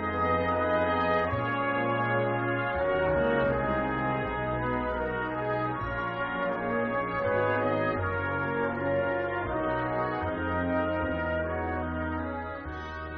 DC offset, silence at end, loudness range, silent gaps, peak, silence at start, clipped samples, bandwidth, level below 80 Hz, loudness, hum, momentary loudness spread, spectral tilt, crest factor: under 0.1%; 0 s; 3 LU; none; -14 dBFS; 0 s; under 0.1%; 6 kHz; -46 dBFS; -29 LUFS; none; 5 LU; -5 dB/octave; 14 dB